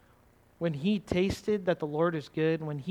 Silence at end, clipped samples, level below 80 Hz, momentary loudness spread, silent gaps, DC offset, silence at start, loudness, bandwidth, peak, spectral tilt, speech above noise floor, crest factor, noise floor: 0 s; under 0.1%; -54 dBFS; 4 LU; none; under 0.1%; 0.6 s; -30 LUFS; 14.5 kHz; -12 dBFS; -7 dB/octave; 32 dB; 18 dB; -62 dBFS